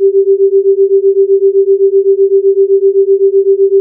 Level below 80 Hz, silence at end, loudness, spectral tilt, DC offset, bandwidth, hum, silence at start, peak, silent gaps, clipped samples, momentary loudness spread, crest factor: -90 dBFS; 0 s; -9 LUFS; -14.5 dB/octave; under 0.1%; 0.5 kHz; none; 0 s; -2 dBFS; none; under 0.1%; 0 LU; 6 dB